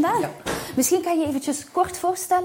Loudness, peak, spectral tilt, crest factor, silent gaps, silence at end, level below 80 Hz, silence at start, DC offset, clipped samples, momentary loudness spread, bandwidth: -23 LUFS; -10 dBFS; -3.5 dB/octave; 14 dB; none; 0 s; -54 dBFS; 0 s; under 0.1%; under 0.1%; 6 LU; 17 kHz